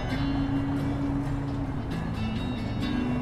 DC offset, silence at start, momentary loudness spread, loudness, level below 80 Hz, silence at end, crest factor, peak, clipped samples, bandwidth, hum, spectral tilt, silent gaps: under 0.1%; 0 s; 4 LU; -30 LUFS; -38 dBFS; 0 s; 12 dB; -16 dBFS; under 0.1%; 12.5 kHz; none; -7.5 dB/octave; none